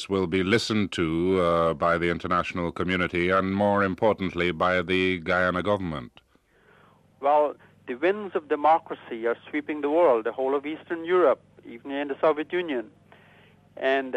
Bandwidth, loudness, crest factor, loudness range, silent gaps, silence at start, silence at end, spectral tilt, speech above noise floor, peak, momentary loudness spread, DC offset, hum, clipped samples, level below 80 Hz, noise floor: 11.5 kHz; -25 LUFS; 16 dB; 3 LU; none; 0 s; 0 s; -6 dB/octave; 37 dB; -10 dBFS; 10 LU; under 0.1%; none; under 0.1%; -56 dBFS; -61 dBFS